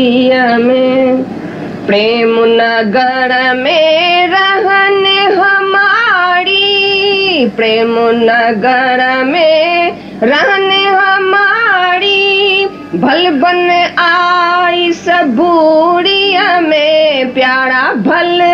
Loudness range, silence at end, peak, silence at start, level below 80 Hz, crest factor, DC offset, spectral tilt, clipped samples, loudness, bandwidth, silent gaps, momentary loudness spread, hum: 2 LU; 0 s; 0 dBFS; 0 s; -54 dBFS; 8 dB; under 0.1%; -5 dB/octave; under 0.1%; -9 LUFS; 7.6 kHz; none; 3 LU; none